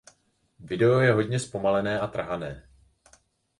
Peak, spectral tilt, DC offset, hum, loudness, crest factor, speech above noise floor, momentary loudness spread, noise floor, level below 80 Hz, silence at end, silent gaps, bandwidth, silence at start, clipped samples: -8 dBFS; -6.5 dB/octave; under 0.1%; none; -25 LUFS; 20 dB; 42 dB; 15 LU; -67 dBFS; -56 dBFS; 1 s; none; 11.5 kHz; 0.6 s; under 0.1%